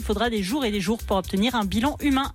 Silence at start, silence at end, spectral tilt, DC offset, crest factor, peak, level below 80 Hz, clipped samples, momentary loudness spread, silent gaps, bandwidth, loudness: 0 s; 0 s; -5 dB/octave; under 0.1%; 12 dB; -12 dBFS; -38 dBFS; under 0.1%; 2 LU; none; 17 kHz; -24 LUFS